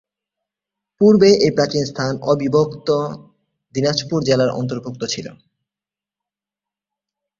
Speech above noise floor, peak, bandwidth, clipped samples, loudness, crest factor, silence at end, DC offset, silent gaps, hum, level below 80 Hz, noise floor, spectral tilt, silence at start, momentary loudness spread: 72 dB; -2 dBFS; 7.6 kHz; under 0.1%; -17 LUFS; 18 dB; 2.05 s; under 0.1%; none; 50 Hz at -45 dBFS; -56 dBFS; -89 dBFS; -5.5 dB/octave; 1 s; 15 LU